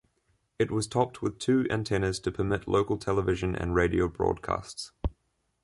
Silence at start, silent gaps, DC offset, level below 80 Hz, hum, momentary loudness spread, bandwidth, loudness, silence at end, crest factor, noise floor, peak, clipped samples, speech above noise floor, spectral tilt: 0.6 s; none; under 0.1%; -44 dBFS; none; 8 LU; 11.5 kHz; -29 LUFS; 0.5 s; 18 dB; -75 dBFS; -10 dBFS; under 0.1%; 47 dB; -6 dB/octave